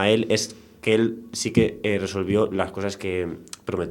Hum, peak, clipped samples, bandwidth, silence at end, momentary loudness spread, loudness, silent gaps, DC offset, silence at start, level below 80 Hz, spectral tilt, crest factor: none; -4 dBFS; under 0.1%; 17 kHz; 0 s; 9 LU; -24 LUFS; none; under 0.1%; 0 s; -52 dBFS; -5 dB/octave; 20 dB